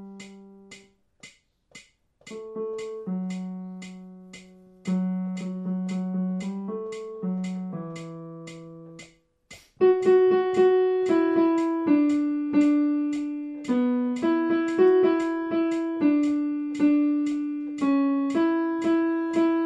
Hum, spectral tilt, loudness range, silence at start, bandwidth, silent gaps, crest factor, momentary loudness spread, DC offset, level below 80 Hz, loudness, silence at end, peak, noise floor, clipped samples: none; -7.5 dB/octave; 14 LU; 0 s; 9.6 kHz; none; 16 dB; 20 LU; under 0.1%; -68 dBFS; -24 LUFS; 0 s; -10 dBFS; -55 dBFS; under 0.1%